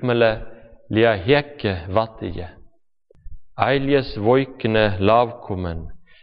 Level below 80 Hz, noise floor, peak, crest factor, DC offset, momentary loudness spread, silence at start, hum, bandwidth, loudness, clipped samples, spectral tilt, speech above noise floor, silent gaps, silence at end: -42 dBFS; -58 dBFS; -4 dBFS; 18 dB; under 0.1%; 15 LU; 0 s; none; 5.4 kHz; -20 LUFS; under 0.1%; -4.5 dB/octave; 38 dB; none; 0.2 s